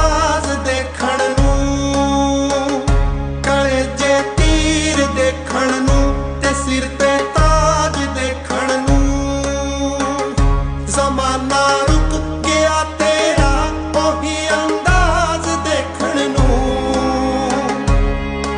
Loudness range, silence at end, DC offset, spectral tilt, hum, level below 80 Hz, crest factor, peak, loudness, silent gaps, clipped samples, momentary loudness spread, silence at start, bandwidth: 2 LU; 0 s; under 0.1%; -4.5 dB/octave; none; -20 dBFS; 14 dB; -2 dBFS; -16 LUFS; none; under 0.1%; 5 LU; 0 s; 10.5 kHz